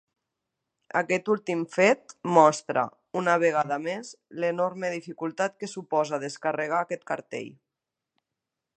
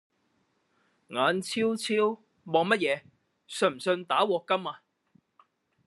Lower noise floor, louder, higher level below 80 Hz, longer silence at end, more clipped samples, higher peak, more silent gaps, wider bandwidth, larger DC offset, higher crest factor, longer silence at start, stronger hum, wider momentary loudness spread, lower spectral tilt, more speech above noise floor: first, -87 dBFS vs -73 dBFS; about the same, -26 LUFS vs -28 LUFS; about the same, -80 dBFS vs -82 dBFS; first, 1.25 s vs 1.1 s; neither; first, -4 dBFS vs -8 dBFS; neither; second, 9.4 kHz vs 12.5 kHz; neither; about the same, 24 dB vs 22 dB; second, 0.95 s vs 1.1 s; neither; about the same, 12 LU vs 12 LU; about the same, -5 dB/octave vs -4 dB/octave; first, 61 dB vs 45 dB